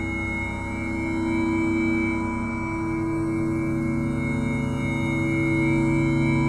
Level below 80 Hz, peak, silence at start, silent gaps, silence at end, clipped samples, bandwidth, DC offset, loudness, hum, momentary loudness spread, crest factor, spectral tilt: -38 dBFS; -12 dBFS; 0 s; none; 0 s; under 0.1%; 11 kHz; under 0.1%; -25 LUFS; none; 6 LU; 12 dB; -7.5 dB/octave